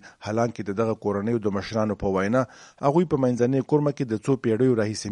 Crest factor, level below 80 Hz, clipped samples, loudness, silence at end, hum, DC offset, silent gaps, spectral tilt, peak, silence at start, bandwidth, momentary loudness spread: 18 dB; -54 dBFS; under 0.1%; -24 LUFS; 0 s; none; under 0.1%; none; -7 dB/octave; -6 dBFS; 0.05 s; 11.5 kHz; 5 LU